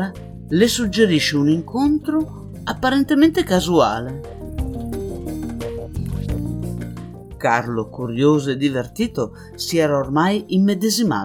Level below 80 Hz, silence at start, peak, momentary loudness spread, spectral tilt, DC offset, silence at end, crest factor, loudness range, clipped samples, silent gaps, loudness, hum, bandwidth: -38 dBFS; 0 s; -2 dBFS; 13 LU; -5.5 dB/octave; under 0.1%; 0 s; 18 dB; 7 LU; under 0.1%; none; -20 LUFS; none; 18.5 kHz